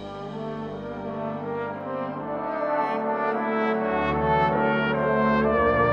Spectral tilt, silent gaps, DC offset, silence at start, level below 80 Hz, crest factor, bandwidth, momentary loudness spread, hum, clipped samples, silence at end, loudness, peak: -8.5 dB/octave; none; under 0.1%; 0 s; -46 dBFS; 16 dB; 6.4 kHz; 12 LU; none; under 0.1%; 0 s; -25 LUFS; -8 dBFS